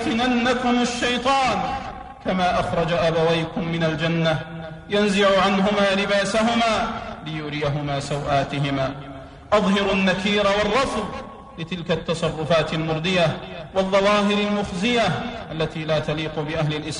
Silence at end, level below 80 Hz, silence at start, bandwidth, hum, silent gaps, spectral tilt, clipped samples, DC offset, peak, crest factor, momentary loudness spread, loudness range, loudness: 0 s; -44 dBFS; 0 s; 10.5 kHz; none; none; -5 dB/octave; under 0.1%; under 0.1%; -6 dBFS; 14 dB; 12 LU; 3 LU; -21 LUFS